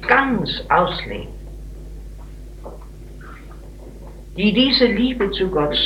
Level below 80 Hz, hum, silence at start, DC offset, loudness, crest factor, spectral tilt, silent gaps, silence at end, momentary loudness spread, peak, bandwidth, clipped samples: -36 dBFS; none; 0 s; under 0.1%; -18 LUFS; 20 dB; -6 dB/octave; none; 0 s; 24 LU; 0 dBFS; 13 kHz; under 0.1%